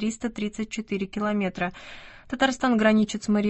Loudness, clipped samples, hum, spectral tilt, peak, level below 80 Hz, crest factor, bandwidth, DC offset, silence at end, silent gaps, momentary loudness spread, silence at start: -25 LUFS; under 0.1%; none; -5 dB/octave; -8 dBFS; -54 dBFS; 18 dB; 8.6 kHz; under 0.1%; 0 s; none; 16 LU; 0 s